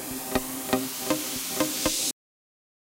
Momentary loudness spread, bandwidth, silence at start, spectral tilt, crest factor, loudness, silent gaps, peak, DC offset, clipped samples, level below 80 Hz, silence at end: 5 LU; 17 kHz; 0 s; -2 dB/octave; 22 dB; -27 LUFS; none; -8 dBFS; under 0.1%; under 0.1%; -52 dBFS; 0.8 s